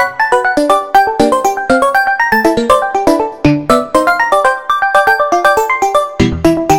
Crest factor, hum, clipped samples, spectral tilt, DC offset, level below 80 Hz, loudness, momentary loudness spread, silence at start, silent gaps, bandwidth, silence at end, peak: 10 dB; none; 0.3%; -5 dB/octave; 1%; -36 dBFS; -11 LUFS; 3 LU; 0 s; none; 17 kHz; 0 s; 0 dBFS